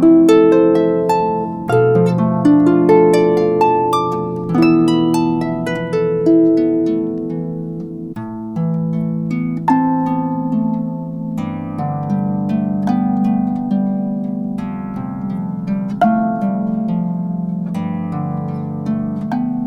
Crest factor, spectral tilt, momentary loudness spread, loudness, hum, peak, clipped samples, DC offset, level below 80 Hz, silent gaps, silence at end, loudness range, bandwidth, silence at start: 16 dB; -8.5 dB/octave; 12 LU; -16 LUFS; none; 0 dBFS; under 0.1%; under 0.1%; -52 dBFS; none; 0 s; 6 LU; 11.5 kHz; 0 s